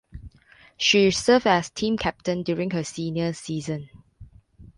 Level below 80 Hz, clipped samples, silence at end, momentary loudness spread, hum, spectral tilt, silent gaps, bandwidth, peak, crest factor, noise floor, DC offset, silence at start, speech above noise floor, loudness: -50 dBFS; under 0.1%; 0.1 s; 12 LU; none; -4.5 dB/octave; none; 11.5 kHz; -6 dBFS; 20 dB; -55 dBFS; under 0.1%; 0.15 s; 31 dB; -23 LUFS